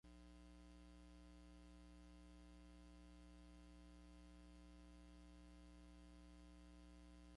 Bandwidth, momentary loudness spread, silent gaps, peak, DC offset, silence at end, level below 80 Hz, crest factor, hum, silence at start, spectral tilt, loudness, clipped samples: 11 kHz; 0 LU; none; -54 dBFS; under 0.1%; 0 s; -66 dBFS; 10 dB; 60 Hz at -65 dBFS; 0.05 s; -5.5 dB/octave; -65 LUFS; under 0.1%